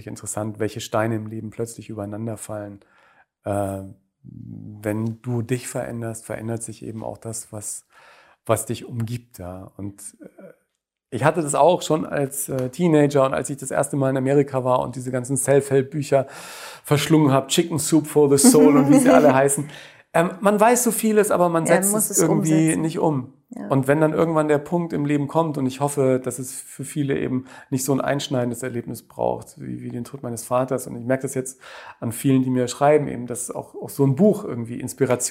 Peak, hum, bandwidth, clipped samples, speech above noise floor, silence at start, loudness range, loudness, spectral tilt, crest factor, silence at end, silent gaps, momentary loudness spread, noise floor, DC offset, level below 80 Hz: 0 dBFS; none; 16 kHz; under 0.1%; 56 dB; 0 s; 13 LU; -21 LUFS; -5.5 dB/octave; 20 dB; 0 s; none; 16 LU; -77 dBFS; under 0.1%; -60 dBFS